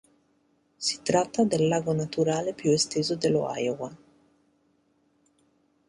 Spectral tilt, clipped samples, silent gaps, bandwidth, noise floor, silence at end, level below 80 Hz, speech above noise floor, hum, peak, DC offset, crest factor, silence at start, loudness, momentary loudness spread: -4.5 dB/octave; under 0.1%; none; 11.5 kHz; -68 dBFS; 1.9 s; -64 dBFS; 42 dB; none; -8 dBFS; under 0.1%; 20 dB; 0.8 s; -26 LUFS; 7 LU